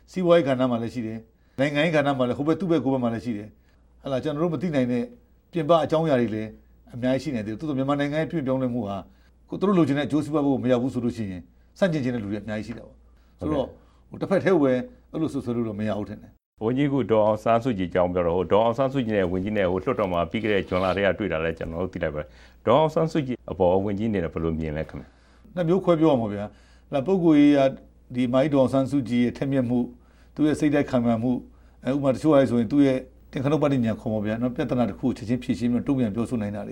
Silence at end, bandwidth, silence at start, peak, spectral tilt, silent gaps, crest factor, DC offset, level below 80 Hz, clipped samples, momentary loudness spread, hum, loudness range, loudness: 0 s; 11 kHz; 0.1 s; -4 dBFS; -7.5 dB/octave; 16.46-16.52 s; 18 dB; under 0.1%; -50 dBFS; under 0.1%; 13 LU; none; 4 LU; -24 LUFS